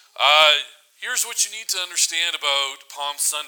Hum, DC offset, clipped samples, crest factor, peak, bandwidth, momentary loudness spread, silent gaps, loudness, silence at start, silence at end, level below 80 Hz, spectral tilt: none; under 0.1%; under 0.1%; 22 dB; 0 dBFS; over 20 kHz; 15 LU; none; -19 LUFS; 0.2 s; 0 s; -84 dBFS; 4 dB/octave